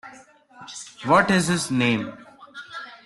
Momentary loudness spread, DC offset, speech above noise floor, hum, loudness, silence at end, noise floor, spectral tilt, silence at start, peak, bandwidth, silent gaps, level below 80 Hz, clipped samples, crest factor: 21 LU; under 0.1%; 28 dB; none; -21 LUFS; 0.1 s; -49 dBFS; -4.5 dB/octave; 0.05 s; -4 dBFS; 12.5 kHz; none; -58 dBFS; under 0.1%; 20 dB